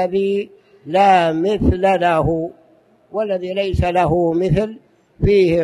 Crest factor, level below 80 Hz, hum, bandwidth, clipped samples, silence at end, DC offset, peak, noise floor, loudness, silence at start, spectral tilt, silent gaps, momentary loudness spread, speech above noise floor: 16 dB; -32 dBFS; none; 11.5 kHz; under 0.1%; 0 s; under 0.1%; -2 dBFS; -53 dBFS; -17 LUFS; 0 s; -7.5 dB/octave; none; 11 LU; 37 dB